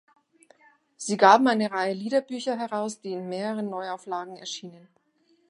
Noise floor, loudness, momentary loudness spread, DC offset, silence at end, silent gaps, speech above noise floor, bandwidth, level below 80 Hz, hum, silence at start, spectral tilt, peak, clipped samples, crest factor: -66 dBFS; -25 LUFS; 18 LU; under 0.1%; 0.7 s; none; 41 dB; 11.5 kHz; -82 dBFS; none; 1 s; -4 dB/octave; -2 dBFS; under 0.1%; 24 dB